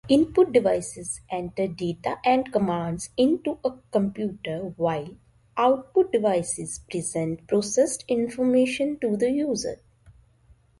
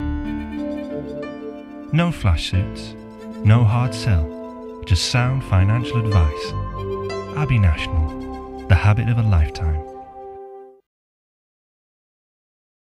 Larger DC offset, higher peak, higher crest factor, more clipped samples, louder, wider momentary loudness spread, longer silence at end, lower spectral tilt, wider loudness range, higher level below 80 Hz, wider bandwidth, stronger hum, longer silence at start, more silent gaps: neither; second, -6 dBFS vs -2 dBFS; about the same, 18 dB vs 20 dB; neither; second, -25 LUFS vs -20 LUFS; second, 10 LU vs 17 LU; second, 0.7 s vs 2.2 s; second, -5 dB/octave vs -6.5 dB/octave; second, 2 LU vs 5 LU; second, -56 dBFS vs -30 dBFS; about the same, 11.5 kHz vs 11.5 kHz; neither; about the same, 0.05 s vs 0 s; neither